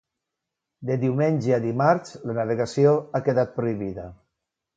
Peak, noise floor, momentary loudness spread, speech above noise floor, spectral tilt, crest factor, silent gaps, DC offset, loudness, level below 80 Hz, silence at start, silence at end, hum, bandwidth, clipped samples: -4 dBFS; -84 dBFS; 12 LU; 61 dB; -8 dB/octave; 20 dB; none; under 0.1%; -23 LUFS; -58 dBFS; 0.8 s; 0.65 s; none; 9 kHz; under 0.1%